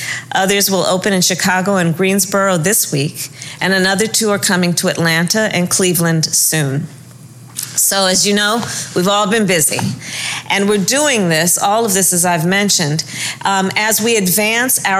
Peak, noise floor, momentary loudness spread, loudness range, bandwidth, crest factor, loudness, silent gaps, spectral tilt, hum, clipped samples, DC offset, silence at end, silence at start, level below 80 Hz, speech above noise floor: -2 dBFS; -36 dBFS; 8 LU; 1 LU; 16 kHz; 12 dB; -13 LUFS; none; -3 dB/octave; none; under 0.1%; under 0.1%; 0 s; 0 s; -54 dBFS; 22 dB